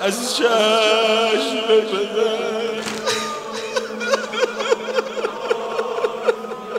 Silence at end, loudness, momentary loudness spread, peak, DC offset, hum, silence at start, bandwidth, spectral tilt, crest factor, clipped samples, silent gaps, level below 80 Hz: 0 s; -20 LUFS; 9 LU; -4 dBFS; under 0.1%; none; 0 s; 16 kHz; -2 dB/octave; 16 dB; under 0.1%; none; -66 dBFS